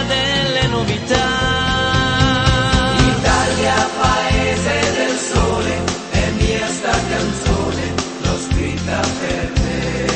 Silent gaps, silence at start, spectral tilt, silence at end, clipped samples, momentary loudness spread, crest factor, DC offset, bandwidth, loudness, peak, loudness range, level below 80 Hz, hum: none; 0 s; -4.5 dB/octave; 0 s; under 0.1%; 5 LU; 16 dB; under 0.1%; 8.8 kHz; -17 LUFS; 0 dBFS; 4 LU; -26 dBFS; none